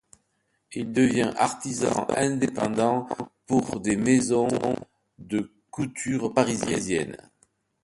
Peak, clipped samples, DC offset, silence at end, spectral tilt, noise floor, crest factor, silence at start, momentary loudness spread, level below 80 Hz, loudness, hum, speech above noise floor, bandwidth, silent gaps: -6 dBFS; under 0.1%; under 0.1%; 0.7 s; -5 dB/octave; -73 dBFS; 20 dB; 0.7 s; 12 LU; -58 dBFS; -25 LUFS; none; 48 dB; 11.5 kHz; none